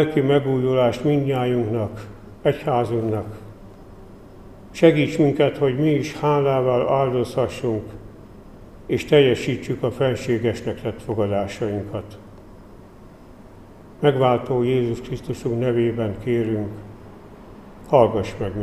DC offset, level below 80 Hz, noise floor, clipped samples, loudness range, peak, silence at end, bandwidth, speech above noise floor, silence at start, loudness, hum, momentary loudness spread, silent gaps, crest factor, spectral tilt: 0.2%; -48 dBFS; -44 dBFS; under 0.1%; 6 LU; 0 dBFS; 0 s; 13.5 kHz; 24 dB; 0 s; -21 LUFS; none; 15 LU; none; 20 dB; -7.5 dB/octave